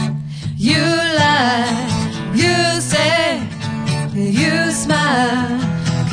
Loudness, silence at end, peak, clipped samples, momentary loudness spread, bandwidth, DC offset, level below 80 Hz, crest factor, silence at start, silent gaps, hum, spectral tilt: -16 LUFS; 0 s; 0 dBFS; under 0.1%; 7 LU; 10.5 kHz; under 0.1%; -44 dBFS; 16 dB; 0 s; none; none; -4.5 dB/octave